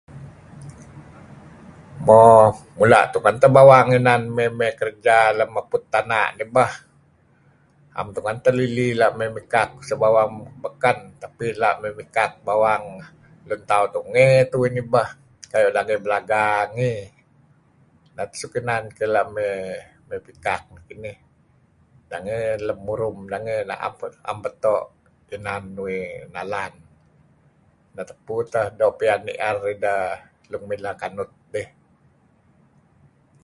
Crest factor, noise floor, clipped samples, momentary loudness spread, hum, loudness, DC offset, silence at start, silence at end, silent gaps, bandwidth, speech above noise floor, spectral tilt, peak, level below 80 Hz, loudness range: 20 dB; -58 dBFS; under 0.1%; 20 LU; none; -20 LUFS; under 0.1%; 0.15 s; 1.8 s; none; 11.5 kHz; 39 dB; -6 dB/octave; 0 dBFS; -56 dBFS; 14 LU